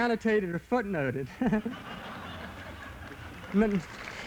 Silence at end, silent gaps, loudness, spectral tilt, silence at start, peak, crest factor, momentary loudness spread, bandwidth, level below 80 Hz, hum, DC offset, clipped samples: 0 s; none; -31 LUFS; -7 dB/octave; 0 s; -12 dBFS; 18 dB; 16 LU; 17 kHz; -52 dBFS; none; under 0.1%; under 0.1%